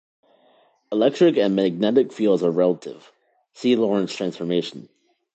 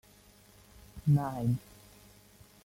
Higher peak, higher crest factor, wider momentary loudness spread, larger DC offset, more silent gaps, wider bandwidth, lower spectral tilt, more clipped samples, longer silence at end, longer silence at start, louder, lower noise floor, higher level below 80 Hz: first, -4 dBFS vs -16 dBFS; about the same, 18 dB vs 18 dB; second, 10 LU vs 24 LU; neither; neither; second, 8.4 kHz vs 16 kHz; second, -6.5 dB/octave vs -8.5 dB/octave; neither; second, 0.55 s vs 1.05 s; about the same, 0.9 s vs 0.95 s; first, -21 LUFS vs -31 LUFS; about the same, -59 dBFS vs -59 dBFS; second, -70 dBFS vs -58 dBFS